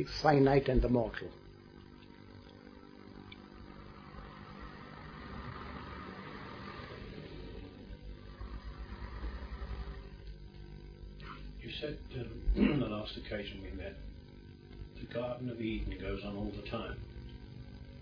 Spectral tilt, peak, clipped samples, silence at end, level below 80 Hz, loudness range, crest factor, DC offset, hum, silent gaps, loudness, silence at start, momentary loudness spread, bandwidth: -5.5 dB/octave; -12 dBFS; under 0.1%; 0 s; -46 dBFS; 12 LU; 26 dB; under 0.1%; 50 Hz at -55 dBFS; none; -37 LUFS; 0 s; 22 LU; 5.4 kHz